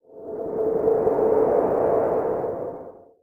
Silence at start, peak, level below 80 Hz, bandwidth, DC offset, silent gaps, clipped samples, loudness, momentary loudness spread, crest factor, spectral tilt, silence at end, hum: 0.1 s; -8 dBFS; -54 dBFS; 2.8 kHz; under 0.1%; none; under 0.1%; -22 LUFS; 13 LU; 14 dB; -10 dB/octave; 0.3 s; none